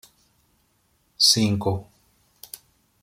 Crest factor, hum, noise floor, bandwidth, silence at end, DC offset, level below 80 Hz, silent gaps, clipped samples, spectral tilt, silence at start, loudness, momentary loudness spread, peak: 24 dB; none; -66 dBFS; 16.5 kHz; 1.2 s; under 0.1%; -62 dBFS; none; under 0.1%; -3.5 dB/octave; 1.2 s; -20 LUFS; 25 LU; -4 dBFS